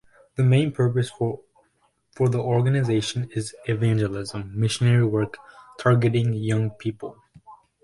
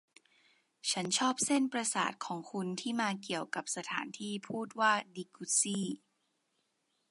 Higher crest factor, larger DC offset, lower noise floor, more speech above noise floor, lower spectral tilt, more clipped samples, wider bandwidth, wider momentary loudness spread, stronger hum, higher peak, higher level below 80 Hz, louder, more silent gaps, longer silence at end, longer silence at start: about the same, 18 dB vs 20 dB; neither; second, -67 dBFS vs -80 dBFS; about the same, 45 dB vs 45 dB; first, -6.5 dB/octave vs -2.5 dB/octave; neither; about the same, 11.5 kHz vs 11.5 kHz; about the same, 12 LU vs 11 LU; neither; first, -6 dBFS vs -16 dBFS; first, -54 dBFS vs -86 dBFS; first, -23 LUFS vs -34 LUFS; neither; second, 0.3 s vs 1.15 s; second, 0.4 s vs 0.85 s